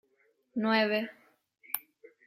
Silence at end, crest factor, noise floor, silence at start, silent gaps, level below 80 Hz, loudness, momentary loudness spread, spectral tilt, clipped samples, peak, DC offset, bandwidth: 0.5 s; 24 dB; -72 dBFS; 0.55 s; none; -82 dBFS; -31 LUFS; 13 LU; -4.5 dB/octave; under 0.1%; -10 dBFS; under 0.1%; 16.5 kHz